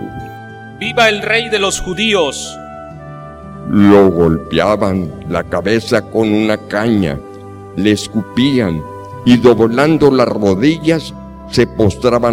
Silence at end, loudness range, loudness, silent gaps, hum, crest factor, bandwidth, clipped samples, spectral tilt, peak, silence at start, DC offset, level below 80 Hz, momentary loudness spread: 0 s; 3 LU; -13 LUFS; none; none; 14 dB; 16 kHz; under 0.1%; -5.5 dB/octave; 0 dBFS; 0 s; under 0.1%; -38 dBFS; 20 LU